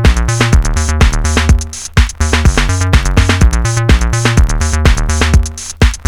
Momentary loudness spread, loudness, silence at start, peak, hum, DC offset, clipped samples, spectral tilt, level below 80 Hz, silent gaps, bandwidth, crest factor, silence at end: 3 LU; -12 LUFS; 0 s; 0 dBFS; none; under 0.1%; 0.1%; -4.5 dB/octave; -12 dBFS; none; 13.5 kHz; 10 dB; 0.05 s